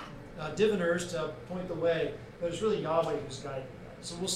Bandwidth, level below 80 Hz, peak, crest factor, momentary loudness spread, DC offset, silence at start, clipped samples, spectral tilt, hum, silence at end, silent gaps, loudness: 14 kHz; -56 dBFS; -14 dBFS; 18 dB; 13 LU; under 0.1%; 0 s; under 0.1%; -4.5 dB/octave; none; 0 s; none; -33 LUFS